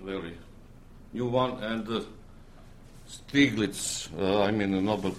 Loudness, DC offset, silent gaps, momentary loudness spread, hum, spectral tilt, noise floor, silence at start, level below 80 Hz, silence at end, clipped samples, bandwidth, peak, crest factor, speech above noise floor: -28 LUFS; under 0.1%; none; 20 LU; none; -4.5 dB/octave; -49 dBFS; 0 s; -52 dBFS; 0 s; under 0.1%; 14.5 kHz; -10 dBFS; 20 dB; 21 dB